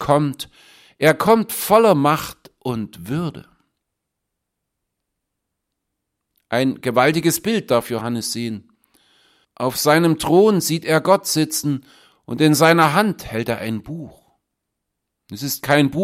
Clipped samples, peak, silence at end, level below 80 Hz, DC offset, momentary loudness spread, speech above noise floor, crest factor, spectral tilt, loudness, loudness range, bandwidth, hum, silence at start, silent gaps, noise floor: under 0.1%; 0 dBFS; 0 s; -54 dBFS; under 0.1%; 15 LU; 61 dB; 20 dB; -5 dB/octave; -18 LUFS; 13 LU; 16.5 kHz; none; 0 s; none; -79 dBFS